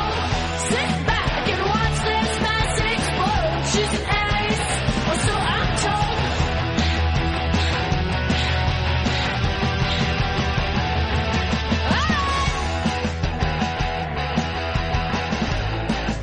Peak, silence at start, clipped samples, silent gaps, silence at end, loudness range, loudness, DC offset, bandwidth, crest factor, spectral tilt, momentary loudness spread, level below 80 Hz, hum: -10 dBFS; 0 s; under 0.1%; none; 0 s; 2 LU; -22 LUFS; 0.1%; 10.5 kHz; 12 dB; -4.5 dB/octave; 3 LU; -28 dBFS; none